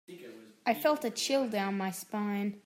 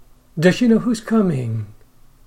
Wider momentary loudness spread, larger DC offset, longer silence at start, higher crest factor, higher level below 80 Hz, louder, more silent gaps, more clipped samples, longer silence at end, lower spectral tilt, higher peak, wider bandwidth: about the same, 17 LU vs 15 LU; neither; second, 0.1 s vs 0.35 s; about the same, 18 dB vs 18 dB; second, -86 dBFS vs -46 dBFS; second, -32 LUFS vs -18 LUFS; neither; neither; second, 0.05 s vs 0.55 s; second, -4 dB/octave vs -7 dB/octave; second, -16 dBFS vs -2 dBFS; first, 16 kHz vs 13.5 kHz